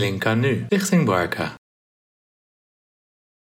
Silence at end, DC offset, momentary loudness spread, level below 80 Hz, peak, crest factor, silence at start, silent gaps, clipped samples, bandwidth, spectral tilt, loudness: 1.95 s; under 0.1%; 8 LU; -60 dBFS; -6 dBFS; 18 dB; 0 s; none; under 0.1%; 16 kHz; -5.5 dB/octave; -21 LUFS